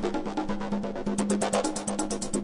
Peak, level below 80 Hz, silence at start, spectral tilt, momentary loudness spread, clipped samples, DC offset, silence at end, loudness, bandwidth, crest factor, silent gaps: -12 dBFS; -46 dBFS; 0 s; -4.5 dB/octave; 6 LU; under 0.1%; under 0.1%; 0 s; -29 LUFS; 11 kHz; 16 dB; none